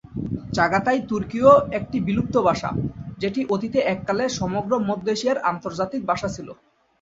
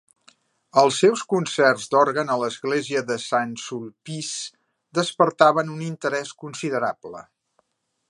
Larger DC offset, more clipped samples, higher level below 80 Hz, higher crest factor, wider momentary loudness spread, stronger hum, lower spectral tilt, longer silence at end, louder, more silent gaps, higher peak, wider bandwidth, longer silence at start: neither; neither; first, -48 dBFS vs -74 dBFS; about the same, 20 dB vs 22 dB; second, 11 LU vs 16 LU; neither; first, -6 dB/octave vs -4 dB/octave; second, 0.5 s vs 0.9 s; about the same, -22 LUFS vs -22 LUFS; neither; about the same, -2 dBFS vs 0 dBFS; second, 7.8 kHz vs 11.5 kHz; second, 0.1 s vs 0.75 s